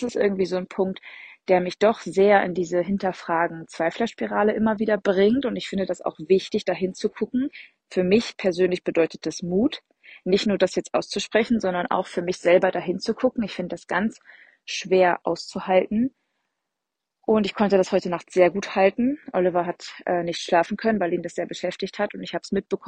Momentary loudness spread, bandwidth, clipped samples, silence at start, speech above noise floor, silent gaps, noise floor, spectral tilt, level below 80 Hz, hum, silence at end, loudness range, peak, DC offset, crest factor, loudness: 9 LU; 9.4 kHz; under 0.1%; 0 s; 61 dB; none; -84 dBFS; -5.5 dB/octave; -60 dBFS; none; 0 s; 2 LU; -4 dBFS; under 0.1%; 20 dB; -23 LUFS